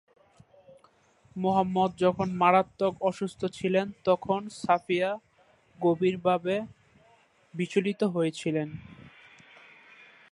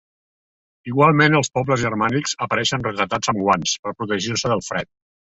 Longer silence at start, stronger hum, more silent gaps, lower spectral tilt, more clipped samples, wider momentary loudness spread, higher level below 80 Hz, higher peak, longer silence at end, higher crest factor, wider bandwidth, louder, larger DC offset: first, 1.35 s vs 0.85 s; neither; second, none vs 3.79-3.83 s; first, -6.5 dB/octave vs -4 dB/octave; neither; about the same, 8 LU vs 10 LU; second, -66 dBFS vs -52 dBFS; second, -8 dBFS vs -2 dBFS; first, 1.25 s vs 0.55 s; about the same, 22 dB vs 20 dB; first, 11.5 kHz vs 8.4 kHz; second, -28 LUFS vs -20 LUFS; neither